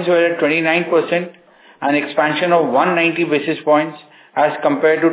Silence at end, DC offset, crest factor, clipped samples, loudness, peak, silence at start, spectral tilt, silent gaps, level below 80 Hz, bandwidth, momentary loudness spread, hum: 0 s; under 0.1%; 16 dB; under 0.1%; -16 LUFS; 0 dBFS; 0 s; -9.5 dB/octave; none; -74 dBFS; 4 kHz; 7 LU; none